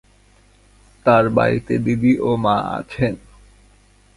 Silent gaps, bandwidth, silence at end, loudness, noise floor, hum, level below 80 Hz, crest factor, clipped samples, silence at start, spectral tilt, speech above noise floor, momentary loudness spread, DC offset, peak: none; 11.5 kHz; 1 s; -18 LUFS; -53 dBFS; 50 Hz at -45 dBFS; -46 dBFS; 18 dB; under 0.1%; 1.05 s; -8 dB/octave; 36 dB; 8 LU; under 0.1%; -2 dBFS